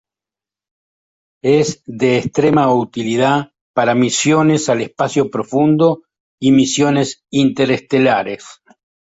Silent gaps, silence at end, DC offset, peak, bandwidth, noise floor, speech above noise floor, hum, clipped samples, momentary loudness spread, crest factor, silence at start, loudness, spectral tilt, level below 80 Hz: 3.61-3.74 s, 6.20-6.38 s; 0.65 s; under 0.1%; -2 dBFS; 8 kHz; -89 dBFS; 74 dB; none; under 0.1%; 7 LU; 14 dB; 1.45 s; -15 LUFS; -5 dB/octave; -56 dBFS